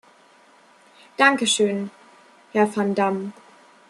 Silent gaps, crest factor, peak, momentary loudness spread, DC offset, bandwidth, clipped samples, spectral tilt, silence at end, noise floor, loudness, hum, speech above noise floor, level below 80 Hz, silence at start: none; 22 dB; -2 dBFS; 18 LU; under 0.1%; 12 kHz; under 0.1%; -3.5 dB/octave; 0.6 s; -54 dBFS; -21 LUFS; none; 33 dB; -72 dBFS; 1.2 s